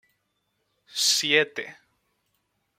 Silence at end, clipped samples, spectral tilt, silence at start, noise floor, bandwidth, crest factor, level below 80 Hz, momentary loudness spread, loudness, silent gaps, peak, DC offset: 1.05 s; under 0.1%; -0.5 dB/octave; 0.95 s; -75 dBFS; 16 kHz; 24 dB; -80 dBFS; 17 LU; -22 LUFS; none; -4 dBFS; under 0.1%